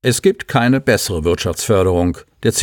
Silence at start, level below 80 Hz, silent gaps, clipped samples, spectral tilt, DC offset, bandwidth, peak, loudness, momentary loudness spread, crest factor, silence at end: 0.05 s; -36 dBFS; none; under 0.1%; -4.5 dB/octave; under 0.1%; over 20 kHz; -2 dBFS; -16 LUFS; 5 LU; 14 dB; 0 s